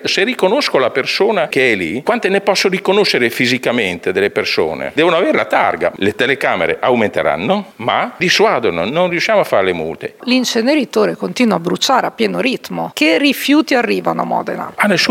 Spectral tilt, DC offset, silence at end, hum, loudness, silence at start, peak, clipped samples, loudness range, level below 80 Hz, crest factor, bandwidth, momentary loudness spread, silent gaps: -4 dB/octave; under 0.1%; 0 s; none; -14 LUFS; 0 s; 0 dBFS; under 0.1%; 1 LU; -56 dBFS; 14 dB; 17 kHz; 5 LU; none